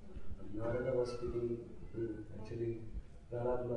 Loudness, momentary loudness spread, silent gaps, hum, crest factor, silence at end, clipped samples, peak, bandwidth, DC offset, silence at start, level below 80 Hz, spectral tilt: -41 LUFS; 14 LU; none; none; 16 dB; 0 s; under 0.1%; -24 dBFS; 10.5 kHz; under 0.1%; 0 s; -52 dBFS; -8.5 dB/octave